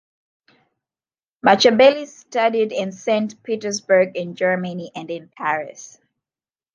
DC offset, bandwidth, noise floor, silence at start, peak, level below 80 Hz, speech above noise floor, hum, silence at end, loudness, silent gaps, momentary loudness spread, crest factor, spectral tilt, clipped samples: under 0.1%; 7.6 kHz; under -90 dBFS; 1.45 s; 0 dBFS; -66 dBFS; over 71 dB; none; 0.9 s; -19 LUFS; none; 17 LU; 20 dB; -4 dB/octave; under 0.1%